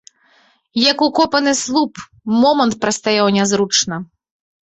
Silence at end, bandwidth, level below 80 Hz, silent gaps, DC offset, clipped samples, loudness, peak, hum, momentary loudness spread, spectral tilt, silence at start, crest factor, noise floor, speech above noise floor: 0.65 s; 8.2 kHz; -56 dBFS; none; under 0.1%; under 0.1%; -15 LUFS; 0 dBFS; none; 9 LU; -3 dB/octave; 0.75 s; 16 dB; -55 dBFS; 39 dB